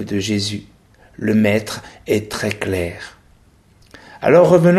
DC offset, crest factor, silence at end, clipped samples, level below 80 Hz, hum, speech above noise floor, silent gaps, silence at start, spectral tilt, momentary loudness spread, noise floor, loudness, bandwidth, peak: under 0.1%; 18 dB; 0 s; under 0.1%; -48 dBFS; none; 35 dB; none; 0 s; -6 dB/octave; 18 LU; -51 dBFS; -18 LUFS; 14 kHz; 0 dBFS